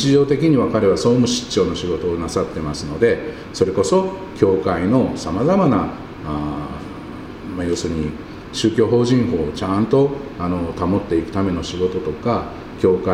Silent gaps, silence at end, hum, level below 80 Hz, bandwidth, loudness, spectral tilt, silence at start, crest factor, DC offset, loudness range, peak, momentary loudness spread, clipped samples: none; 0 s; none; -40 dBFS; 11.5 kHz; -19 LUFS; -6 dB/octave; 0 s; 18 dB; under 0.1%; 4 LU; 0 dBFS; 12 LU; under 0.1%